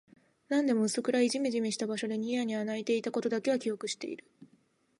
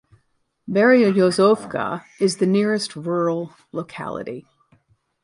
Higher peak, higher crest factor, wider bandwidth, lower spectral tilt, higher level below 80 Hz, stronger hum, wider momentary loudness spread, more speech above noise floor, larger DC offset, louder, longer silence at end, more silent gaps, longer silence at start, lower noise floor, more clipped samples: second, -16 dBFS vs -4 dBFS; about the same, 16 dB vs 18 dB; about the same, 11.5 kHz vs 11.5 kHz; second, -4 dB/octave vs -5.5 dB/octave; second, -84 dBFS vs -64 dBFS; neither; second, 8 LU vs 16 LU; second, 38 dB vs 48 dB; neither; second, -31 LUFS vs -20 LUFS; second, 0.55 s vs 0.85 s; neither; second, 0.5 s vs 0.65 s; about the same, -69 dBFS vs -68 dBFS; neither